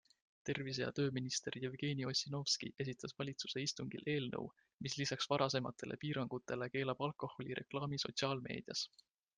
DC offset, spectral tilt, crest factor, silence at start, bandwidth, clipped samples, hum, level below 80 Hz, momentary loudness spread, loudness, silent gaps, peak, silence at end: under 0.1%; -4 dB/octave; 22 dB; 0.45 s; 10 kHz; under 0.1%; none; -76 dBFS; 8 LU; -41 LUFS; 4.74-4.78 s; -20 dBFS; 0.5 s